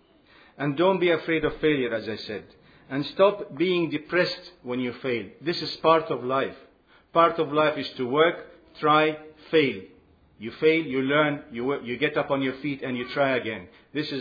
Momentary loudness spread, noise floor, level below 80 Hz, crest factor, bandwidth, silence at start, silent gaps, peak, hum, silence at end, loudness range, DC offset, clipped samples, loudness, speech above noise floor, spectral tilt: 12 LU; -56 dBFS; -58 dBFS; 20 dB; 5 kHz; 0.6 s; none; -6 dBFS; none; 0 s; 3 LU; under 0.1%; under 0.1%; -25 LUFS; 31 dB; -7 dB/octave